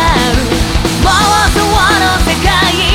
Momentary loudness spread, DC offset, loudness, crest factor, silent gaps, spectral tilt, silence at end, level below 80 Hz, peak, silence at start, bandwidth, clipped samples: 4 LU; under 0.1%; -10 LUFS; 10 dB; none; -3.5 dB/octave; 0 s; -18 dBFS; 0 dBFS; 0 s; 17.5 kHz; under 0.1%